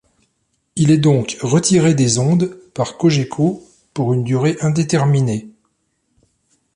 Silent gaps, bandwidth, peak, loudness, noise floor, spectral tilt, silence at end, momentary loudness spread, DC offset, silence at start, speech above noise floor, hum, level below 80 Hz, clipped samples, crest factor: none; 11 kHz; -2 dBFS; -16 LUFS; -67 dBFS; -6 dB/octave; 1.25 s; 10 LU; under 0.1%; 0.75 s; 52 dB; none; -52 dBFS; under 0.1%; 14 dB